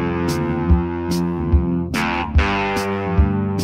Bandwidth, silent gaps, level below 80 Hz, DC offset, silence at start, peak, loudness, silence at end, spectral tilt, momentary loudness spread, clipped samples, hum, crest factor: 15.5 kHz; none; -24 dBFS; under 0.1%; 0 s; -2 dBFS; -20 LUFS; 0 s; -6.5 dB/octave; 3 LU; under 0.1%; none; 16 dB